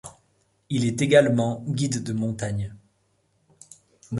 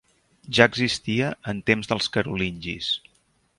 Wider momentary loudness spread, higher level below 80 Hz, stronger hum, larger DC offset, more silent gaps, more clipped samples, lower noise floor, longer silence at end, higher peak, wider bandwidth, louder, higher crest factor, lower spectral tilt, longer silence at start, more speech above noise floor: first, 13 LU vs 10 LU; about the same, -54 dBFS vs -52 dBFS; neither; neither; neither; neither; about the same, -68 dBFS vs -65 dBFS; second, 0 s vs 0.6 s; second, -4 dBFS vs 0 dBFS; about the same, 11.5 kHz vs 11.5 kHz; about the same, -24 LUFS vs -23 LUFS; about the same, 22 dB vs 24 dB; first, -6 dB/octave vs -4.5 dB/octave; second, 0.05 s vs 0.5 s; about the same, 45 dB vs 42 dB